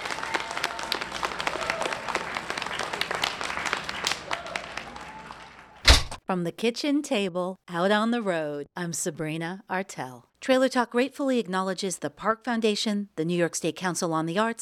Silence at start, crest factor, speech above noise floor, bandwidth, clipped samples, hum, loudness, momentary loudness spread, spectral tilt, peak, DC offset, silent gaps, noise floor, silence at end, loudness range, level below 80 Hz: 0 s; 26 dB; 20 dB; 17.5 kHz; under 0.1%; none; -27 LUFS; 10 LU; -3.5 dB/octave; -2 dBFS; under 0.1%; none; -47 dBFS; 0 s; 4 LU; -38 dBFS